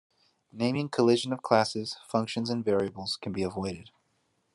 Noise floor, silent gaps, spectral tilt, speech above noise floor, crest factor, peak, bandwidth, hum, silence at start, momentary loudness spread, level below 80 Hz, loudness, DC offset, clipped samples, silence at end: -73 dBFS; none; -5.5 dB/octave; 45 dB; 22 dB; -6 dBFS; 12 kHz; none; 0.55 s; 10 LU; -72 dBFS; -29 LUFS; under 0.1%; under 0.1%; 0.65 s